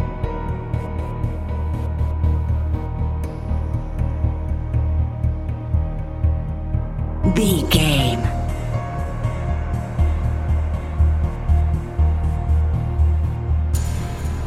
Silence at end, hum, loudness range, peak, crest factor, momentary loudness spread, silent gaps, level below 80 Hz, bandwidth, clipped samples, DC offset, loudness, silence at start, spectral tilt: 0 s; none; 3 LU; -2 dBFS; 18 dB; 7 LU; none; -22 dBFS; 14 kHz; under 0.1%; under 0.1%; -22 LUFS; 0 s; -6 dB/octave